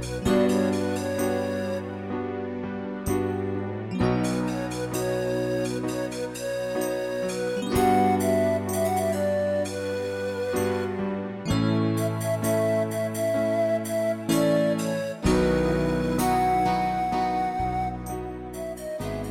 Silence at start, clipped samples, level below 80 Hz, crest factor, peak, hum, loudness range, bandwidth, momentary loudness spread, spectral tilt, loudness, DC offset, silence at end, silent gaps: 0 s; under 0.1%; -44 dBFS; 16 dB; -10 dBFS; none; 4 LU; 16.5 kHz; 9 LU; -6 dB/octave; -26 LUFS; under 0.1%; 0 s; none